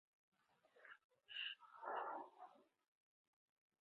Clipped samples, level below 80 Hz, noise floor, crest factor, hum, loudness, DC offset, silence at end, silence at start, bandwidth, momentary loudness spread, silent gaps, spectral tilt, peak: under 0.1%; under -90 dBFS; -77 dBFS; 22 dB; none; -51 LUFS; under 0.1%; 1.2 s; 0.75 s; 5.4 kHz; 16 LU; 1.04-1.10 s; 3 dB/octave; -34 dBFS